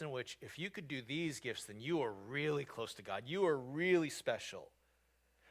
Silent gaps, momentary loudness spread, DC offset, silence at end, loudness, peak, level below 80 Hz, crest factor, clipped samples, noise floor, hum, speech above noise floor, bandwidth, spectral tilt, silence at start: none; 11 LU; under 0.1%; 0.85 s; -40 LUFS; -22 dBFS; -76 dBFS; 20 dB; under 0.1%; -76 dBFS; none; 36 dB; 16 kHz; -5 dB/octave; 0 s